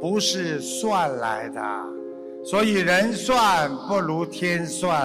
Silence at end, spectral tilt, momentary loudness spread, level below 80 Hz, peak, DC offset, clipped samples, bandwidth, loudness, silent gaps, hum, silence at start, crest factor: 0 s; -4 dB/octave; 11 LU; -56 dBFS; -10 dBFS; under 0.1%; under 0.1%; 15.5 kHz; -23 LUFS; none; none; 0 s; 14 dB